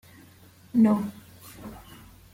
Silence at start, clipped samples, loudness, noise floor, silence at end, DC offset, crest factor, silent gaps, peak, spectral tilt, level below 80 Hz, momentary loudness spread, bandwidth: 0.75 s; under 0.1%; -24 LUFS; -53 dBFS; 0.55 s; under 0.1%; 18 dB; none; -10 dBFS; -7.5 dB/octave; -58 dBFS; 25 LU; 16.5 kHz